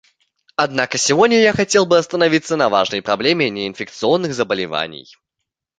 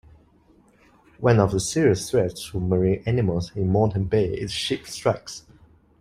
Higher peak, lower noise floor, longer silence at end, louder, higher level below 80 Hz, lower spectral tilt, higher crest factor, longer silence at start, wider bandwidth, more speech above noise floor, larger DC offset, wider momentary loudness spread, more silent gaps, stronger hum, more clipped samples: first, 0 dBFS vs -4 dBFS; first, -80 dBFS vs -57 dBFS; first, 0.8 s vs 0.6 s; first, -16 LUFS vs -23 LUFS; second, -56 dBFS vs -48 dBFS; second, -3.5 dB/octave vs -6 dB/octave; about the same, 18 dB vs 20 dB; second, 0.6 s vs 1.2 s; second, 9.6 kHz vs 15.5 kHz; first, 63 dB vs 35 dB; neither; first, 10 LU vs 7 LU; neither; neither; neither